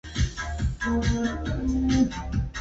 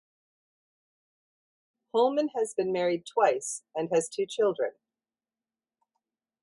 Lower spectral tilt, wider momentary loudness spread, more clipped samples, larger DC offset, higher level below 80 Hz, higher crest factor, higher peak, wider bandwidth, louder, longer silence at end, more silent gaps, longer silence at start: first, -6 dB/octave vs -4 dB/octave; about the same, 7 LU vs 8 LU; neither; neither; first, -32 dBFS vs -80 dBFS; second, 14 dB vs 20 dB; about the same, -12 dBFS vs -10 dBFS; second, 8 kHz vs 11.5 kHz; about the same, -27 LUFS vs -28 LUFS; second, 0 s vs 1.7 s; neither; second, 0.05 s vs 1.95 s